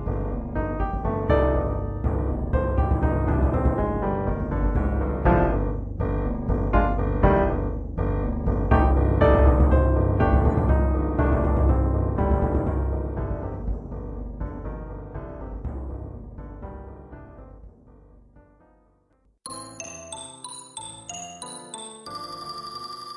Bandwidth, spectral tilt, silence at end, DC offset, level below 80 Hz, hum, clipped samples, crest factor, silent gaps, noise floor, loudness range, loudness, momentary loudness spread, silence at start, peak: 11.5 kHz; -7.5 dB/octave; 0 s; under 0.1%; -28 dBFS; none; under 0.1%; 18 dB; none; -64 dBFS; 19 LU; -24 LUFS; 17 LU; 0 s; -6 dBFS